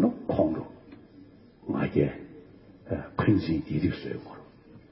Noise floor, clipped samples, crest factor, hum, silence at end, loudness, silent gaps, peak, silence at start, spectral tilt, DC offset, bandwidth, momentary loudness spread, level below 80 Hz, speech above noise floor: -52 dBFS; under 0.1%; 20 dB; none; 0.1 s; -29 LUFS; none; -10 dBFS; 0 s; -12 dB/octave; under 0.1%; 5.8 kHz; 23 LU; -50 dBFS; 25 dB